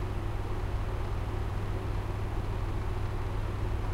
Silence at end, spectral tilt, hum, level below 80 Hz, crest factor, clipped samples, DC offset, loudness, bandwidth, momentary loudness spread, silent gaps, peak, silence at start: 0 s; -7 dB/octave; none; -34 dBFS; 12 dB; under 0.1%; under 0.1%; -35 LUFS; 13.5 kHz; 1 LU; none; -20 dBFS; 0 s